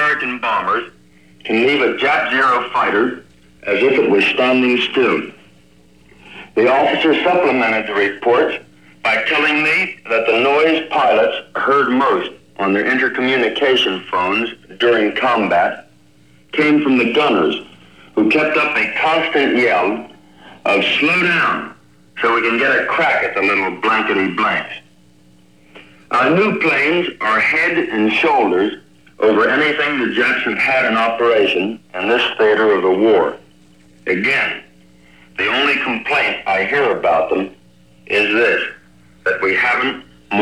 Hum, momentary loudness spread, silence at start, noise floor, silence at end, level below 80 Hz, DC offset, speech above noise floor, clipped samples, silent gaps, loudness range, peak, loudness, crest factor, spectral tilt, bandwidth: none; 8 LU; 0 s; -50 dBFS; 0 s; -60 dBFS; 0.2%; 35 dB; under 0.1%; none; 2 LU; -2 dBFS; -15 LUFS; 14 dB; -5 dB/octave; 11.5 kHz